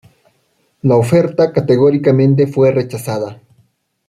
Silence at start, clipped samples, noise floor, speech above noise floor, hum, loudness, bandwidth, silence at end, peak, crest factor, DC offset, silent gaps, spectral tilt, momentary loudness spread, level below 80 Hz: 0.85 s; under 0.1%; -61 dBFS; 49 dB; none; -13 LUFS; 15 kHz; 0.75 s; -2 dBFS; 12 dB; under 0.1%; none; -8 dB/octave; 10 LU; -52 dBFS